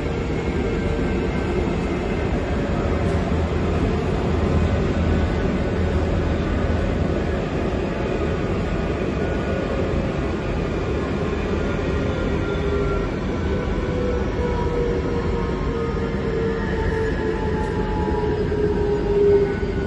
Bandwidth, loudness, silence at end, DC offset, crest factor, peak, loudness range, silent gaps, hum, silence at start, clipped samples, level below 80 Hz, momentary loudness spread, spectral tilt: 11 kHz; -23 LUFS; 0 s; under 0.1%; 14 dB; -6 dBFS; 2 LU; none; none; 0 s; under 0.1%; -28 dBFS; 3 LU; -7.5 dB/octave